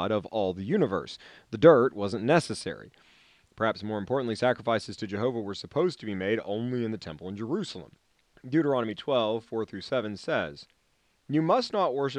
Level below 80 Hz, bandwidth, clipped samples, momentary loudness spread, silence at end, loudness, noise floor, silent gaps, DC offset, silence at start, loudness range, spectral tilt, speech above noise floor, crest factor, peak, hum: -66 dBFS; 10.5 kHz; under 0.1%; 13 LU; 0 s; -28 LUFS; -70 dBFS; none; under 0.1%; 0 s; 5 LU; -6 dB/octave; 42 dB; 22 dB; -6 dBFS; none